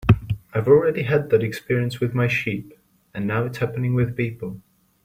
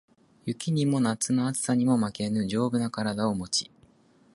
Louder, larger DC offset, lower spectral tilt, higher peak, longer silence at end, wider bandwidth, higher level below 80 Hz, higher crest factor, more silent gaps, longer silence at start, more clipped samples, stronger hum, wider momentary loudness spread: first, -22 LUFS vs -27 LUFS; neither; first, -8 dB/octave vs -5 dB/octave; first, -2 dBFS vs -12 dBFS; second, 0.45 s vs 0.7 s; first, 16 kHz vs 12 kHz; first, -44 dBFS vs -62 dBFS; about the same, 20 dB vs 16 dB; neither; second, 0 s vs 0.45 s; neither; neither; first, 14 LU vs 7 LU